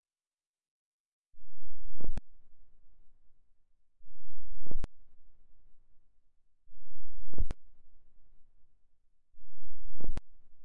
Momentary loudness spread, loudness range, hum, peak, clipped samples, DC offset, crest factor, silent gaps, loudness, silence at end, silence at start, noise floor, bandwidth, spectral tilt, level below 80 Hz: 21 LU; 5 LU; none; -12 dBFS; under 0.1%; under 0.1%; 10 dB; 0.47-0.54 s, 0.68-1.25 s; -47 LUFS; 0 s; 0 s; under -90 dBFS; 2.7 kHz; -8 dB/octave; -44 dBFS